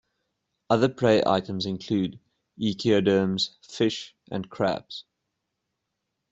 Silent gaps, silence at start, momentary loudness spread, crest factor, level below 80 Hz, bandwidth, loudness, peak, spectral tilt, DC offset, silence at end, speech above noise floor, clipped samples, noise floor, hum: none; 0.7 s; 14 LU; 20 dB; -62 dBFS; 8 kHz; -25 LUFS; -6 dBFS; -6 dB/octave; under 0.1%; 1.3 s; 56 dB; under 0.1%; -81 dBFS; none